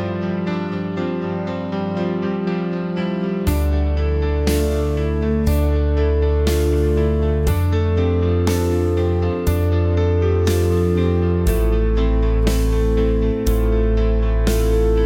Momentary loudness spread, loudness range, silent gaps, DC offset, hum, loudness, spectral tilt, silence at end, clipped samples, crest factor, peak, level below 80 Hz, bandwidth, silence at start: 5 LU; 3 LU; none; 0.1%; none; -19 LUFS; -7.5 dB/octave; 0 s; under 0.1%; 14 dB; -4 dBFS; -22 dBFS; 17 kHz; 0 s